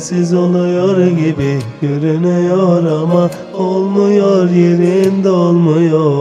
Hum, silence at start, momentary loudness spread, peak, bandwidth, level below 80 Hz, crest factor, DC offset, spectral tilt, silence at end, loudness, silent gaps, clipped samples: none; 0 s; 6 LU; 0 dBFS; 9.6 kHz; -50 dBFS; 10 dB; under 0.1%; -8 dB/octave; 0 s; -12 LUFS; none; under 0.1%